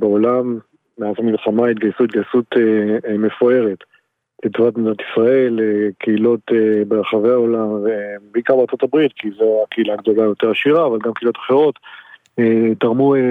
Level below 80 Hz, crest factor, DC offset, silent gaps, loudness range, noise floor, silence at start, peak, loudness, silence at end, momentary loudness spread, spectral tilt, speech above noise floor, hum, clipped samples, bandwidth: -68 dBFS; 14 dB; under 0.1%; none; 1 LU; -52 dBFS; 0 s; 0 dBFS; -16 LUFS; 0 s; 7 LU; -9 dB/octave; 36 dB; none; under 0.1%; 4.4 kHz